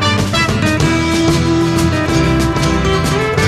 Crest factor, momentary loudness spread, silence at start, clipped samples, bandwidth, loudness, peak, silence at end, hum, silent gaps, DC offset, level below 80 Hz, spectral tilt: 12 dB; 1 LU; 0 s; under 0.1%; 14 kHz; -13 LUFS; -2 dBFS; 0 s; none; none; under 0.1%; -26 dBFS; -5 dB/octave